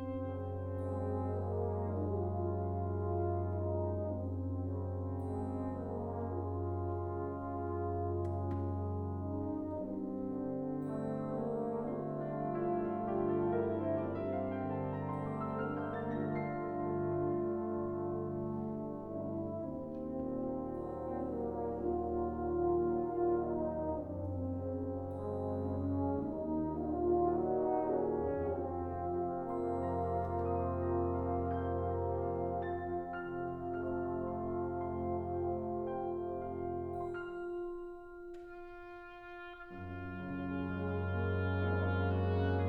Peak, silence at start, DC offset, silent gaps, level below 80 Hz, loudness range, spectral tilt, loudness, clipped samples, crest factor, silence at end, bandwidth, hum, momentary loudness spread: -22 dBFS; 0 s; under 0.1%; none; -56 dBFS; 5 LU; -10.5 dB/octave; -38 LUFS; under 0.1%; 16 dB; 0 s; 4.4 kHz; none; 7 LU